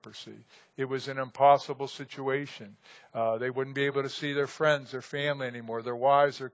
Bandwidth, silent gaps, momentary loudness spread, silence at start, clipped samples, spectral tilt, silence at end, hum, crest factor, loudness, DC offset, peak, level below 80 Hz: 8 kHz; none; 17 LU; 0.05 s; under 0.1%; -5.5 dB/octave; 0.05 s; none; 20 dB; -29 LUFS; under 0.1%; -8 dBFS; -82 dBFS